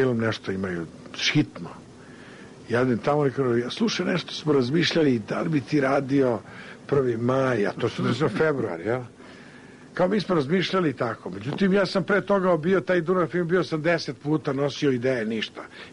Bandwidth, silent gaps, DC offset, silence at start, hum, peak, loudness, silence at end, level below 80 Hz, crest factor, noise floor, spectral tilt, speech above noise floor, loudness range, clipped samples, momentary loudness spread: 10.5 kHz; none; under 0.1%; 0 s; none; -12 dBFS; -24 LUFS; 0 s; -60 dBFS; 12 dB; -46 dBFS; -6 dB/octave; 22 dB; 3 LU; under 0.1%; 11 LU